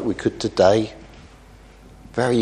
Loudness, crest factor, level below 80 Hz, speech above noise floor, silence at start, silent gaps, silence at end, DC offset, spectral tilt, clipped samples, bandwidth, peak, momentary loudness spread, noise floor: -20 LUFS; 20 dB; -48 dBFS; 27 dB; 0 s; none; 0 s; under 0.1%; -6 dB/octave; under 0.1%; 11 kHz; -2 dBFS; 14 LU; -46 dBFS